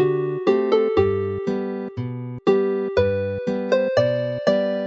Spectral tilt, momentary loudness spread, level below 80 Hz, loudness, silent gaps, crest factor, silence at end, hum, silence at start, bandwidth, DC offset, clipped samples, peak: -7.5 dB/octave; 9 LU; -50 dBFS; -22 LUFS; none; 16 dB; 0 s; none; 0 s; 7.2 kHz; under 0.1%; under 0.1%; -4 dBFS